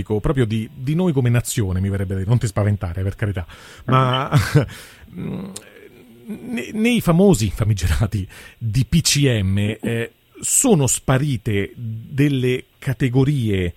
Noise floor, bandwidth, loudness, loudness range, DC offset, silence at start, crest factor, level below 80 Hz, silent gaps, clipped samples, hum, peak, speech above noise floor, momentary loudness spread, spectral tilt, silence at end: -44 dBFS; 16.5 kHz; -19 LUFS; 4 LU; under 0.1%; 0 s; 18 dB; -36 dBFS; none; under 0.1%; none; 0 dBFS; 25 dB; 14 LU; -5 dB/octave; 0.05 s